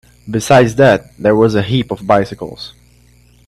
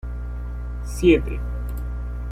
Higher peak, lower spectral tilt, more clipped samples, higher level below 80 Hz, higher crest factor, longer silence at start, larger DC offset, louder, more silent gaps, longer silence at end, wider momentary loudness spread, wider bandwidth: first, 0 dBFS vs -4 dBFS; about the same, -6 dB/octave vs -7 dB/octave; neither; second, -44 dBFS vs -28 dBFS; about the same, 14 dB vs 18 dB; first, 0.25 s vs 0.05 s; neither; first, -13 LUFS vs -24 LUFS; neither; first, 0.8 s vs 0 s; first, 17 LU vs 14 LU; about the same, 14 kHz vs 15 kHz